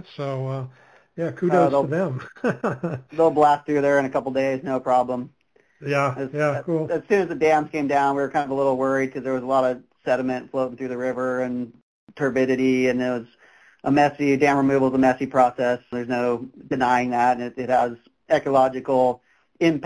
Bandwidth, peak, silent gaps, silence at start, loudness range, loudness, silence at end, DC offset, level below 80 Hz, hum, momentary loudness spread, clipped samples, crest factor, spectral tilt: 11 kHz; -6 dBFS; 11.82-12.07 s; 0.2 s; 4 LU; -22 LUFS; 0 s; under 0.1%; -60 dBFS; none; 11 LU; under 0.1%; 16 dB; -7 dB/octave